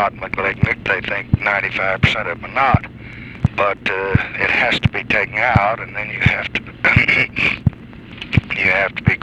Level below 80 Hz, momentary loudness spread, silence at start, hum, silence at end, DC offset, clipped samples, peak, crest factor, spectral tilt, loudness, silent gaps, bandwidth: -34 dBFS; 9 LU; 0 s; none; 0 s; under 0.1%; under 0.1%; 0 dBFS; 18 dB; -6.5 dB/octave; -17 LUFS; none; 9.8 kHz